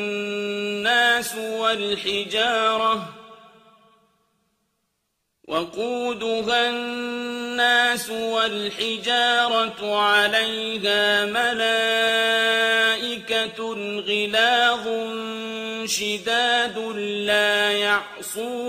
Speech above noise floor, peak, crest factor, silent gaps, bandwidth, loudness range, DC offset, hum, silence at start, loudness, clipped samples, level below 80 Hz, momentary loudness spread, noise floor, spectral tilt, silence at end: 53 dB; -6 dBFS; 18 dB; none; 15.5 kHz; 7 LU; under 0.1%; none; 0 s; -21 LUFS; under 0.1%; -66 dBFS; 10 LU; -75 dBFS; -1.5 dB/octave; 0 s